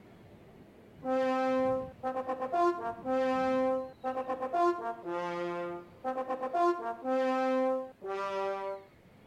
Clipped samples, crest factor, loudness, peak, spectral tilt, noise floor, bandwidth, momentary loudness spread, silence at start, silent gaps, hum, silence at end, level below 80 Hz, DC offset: under 0.1%; 14 dB; -33 LUFS; -18 dBFS; -6 dB/octave; -55 dBFS; 10 kHz; 9 LU; 0.05 s; none; none; 0.4 s; -70 dBFS; under 0.1%